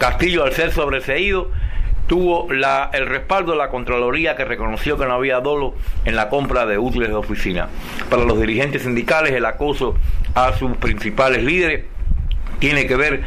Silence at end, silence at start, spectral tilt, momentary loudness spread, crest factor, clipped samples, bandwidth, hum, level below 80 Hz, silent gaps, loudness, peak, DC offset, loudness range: 0 s; 0 s; -6 dB/octave; 8 LU; 12 dB; under 0.1%; 15 kHz; none; -24 dBFS; none; -19 LUFS; -6 dBFS; under 0.1%; 2 LU